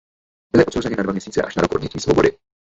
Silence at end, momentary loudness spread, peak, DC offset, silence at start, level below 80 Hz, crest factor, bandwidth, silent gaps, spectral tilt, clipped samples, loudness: 0.4 s; 6 LU; -2 dBFS; under 0.1%; 0.55 s; -42 dBFS; 18 dB; 8.2 kHz; none; -6 dB/octave; under 0.1%; -19 LUFS